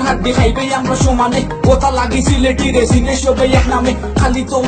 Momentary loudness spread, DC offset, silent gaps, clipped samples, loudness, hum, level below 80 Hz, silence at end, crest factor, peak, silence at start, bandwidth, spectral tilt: 3 LU; under 0.1%; none; under 0.1%; -13 LUFS; none; -20 dBFS; 0 s; 12 dB; 0 dBFS; 0 s; 9.2 kHz; -5.5 dB/octave